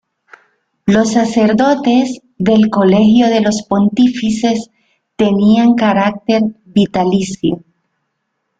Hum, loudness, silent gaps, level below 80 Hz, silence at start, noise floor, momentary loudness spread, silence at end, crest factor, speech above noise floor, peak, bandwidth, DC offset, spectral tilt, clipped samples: none; -13 LUFS; none; -48 dBFS; 0.85 s; -70 dBFS; 8 LU; 1 s; 12 dB; 59 dB; -2 dBFS; 9 kHz; under 0.1%; -6 dB/octave; under 0.1%